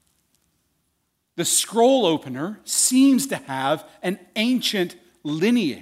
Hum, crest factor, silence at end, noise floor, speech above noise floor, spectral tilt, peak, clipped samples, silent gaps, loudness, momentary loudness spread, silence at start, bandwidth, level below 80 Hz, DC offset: none; 16 dB; 0 s; -72 dBFS; 52 dB; -3 dB/octave; -6 dBFS; under 0.1%; none; -21 LUFS; 13 LU; 1.35 s; 16 kHz; -72 dBFS; under 0.1%